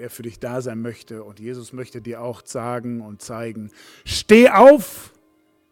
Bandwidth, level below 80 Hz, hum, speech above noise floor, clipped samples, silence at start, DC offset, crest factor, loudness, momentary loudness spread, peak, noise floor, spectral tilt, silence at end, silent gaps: 17.5 kHz; -52 dBFS; none; 42 dB; under 0.1%; 0 s; under 0.1%; 18 dB; -14 LUFS; 25 LU; 0 dBFS; -61 dBFS; -5 dB/octave; 0.7 s; none